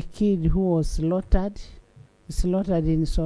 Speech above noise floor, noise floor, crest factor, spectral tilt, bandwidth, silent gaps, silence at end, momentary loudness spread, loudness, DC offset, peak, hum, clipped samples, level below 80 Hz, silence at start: 29 dB; -51 dBFS; 18 dB; -8 dB/octave; 11 kHz; none; 0 s; 9 LU; -24 LUFS; under 0.1%; -6 dBFS; none; under 0.1%; -28 dBFS; 0 s